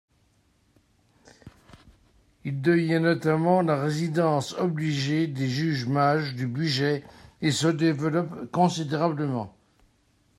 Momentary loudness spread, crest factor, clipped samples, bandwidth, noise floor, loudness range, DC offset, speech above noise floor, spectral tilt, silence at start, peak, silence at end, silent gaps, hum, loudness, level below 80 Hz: 8 LU; 20 dB; under 0.1%; 13 kHz; -65 dBFS; 2 LU; under 0.1%; 41 dB; -6 dB/octave; 1.45 s; -6 dBFS; 0.9 s; none; none; -25 LUFS; -64 dBFS